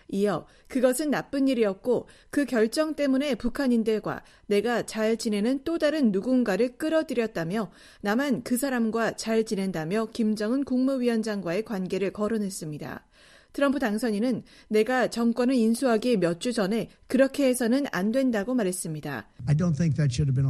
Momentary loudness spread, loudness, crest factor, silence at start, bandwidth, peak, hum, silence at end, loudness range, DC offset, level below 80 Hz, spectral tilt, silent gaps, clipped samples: 8 LU; -26 LUFS; 18 dB; 0.1 s; 14.5 kHz; -8 dBFS; none; 0 s; 3 LU; under 0.1%; -54 dBFS; -6 dB/octave; none; under 0.1%